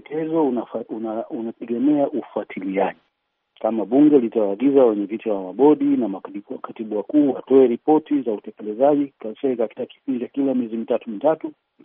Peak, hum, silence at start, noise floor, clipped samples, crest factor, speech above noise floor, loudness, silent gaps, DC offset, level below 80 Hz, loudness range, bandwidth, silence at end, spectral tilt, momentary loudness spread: -4 dBFS; none; 0.1 s; -64 dBFS; under 0.1%; 16 dB; 44 dB; -21 LUFS; none; under 0.1%; -76 dBFS; 5 LU; 3.7 kHz; 0.35 s; -7 dB/octave; 14 LU